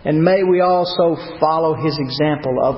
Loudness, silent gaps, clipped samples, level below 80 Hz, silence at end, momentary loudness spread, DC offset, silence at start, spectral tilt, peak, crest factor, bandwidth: -17 LUFS; none; under 0.1%; -50 dBFS; 0 s; 5 LU; under 0.1%; 0.05 s; -11 dB/octave; -2 dBFS; 14 dB; 5.8 kHz